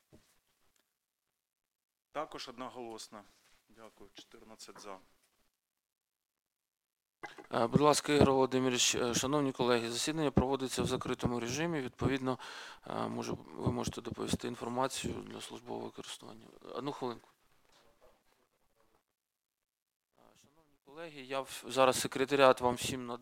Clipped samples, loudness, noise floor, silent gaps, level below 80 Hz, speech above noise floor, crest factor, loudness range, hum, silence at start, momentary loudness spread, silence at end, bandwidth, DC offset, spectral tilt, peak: under 0.1%; -33 LUFS; -88 dBFS; 5.92-5.96 s, 19.82-19.86 s, 19.96-20.00 s; -58 dBFS; 54 dB; 28 dB; 20 LU; none; 2.15 s; 21 LU; 0 s; 16.5 kHz; under 0.1%; -4 dB/octave; -8 dBFS